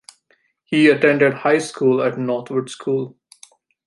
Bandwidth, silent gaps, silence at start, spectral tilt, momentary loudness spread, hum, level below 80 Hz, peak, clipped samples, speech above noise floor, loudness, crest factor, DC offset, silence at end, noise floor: 11.5 kHz; none; 0.7 s; -5.5 dB/octave; 10 LU; none; -68 dBFS; -2 dBFS; under 0.1%; 45 dB; -18 LUFS; 18 dB; under 0.1%; 0.8 s; -63 dBFS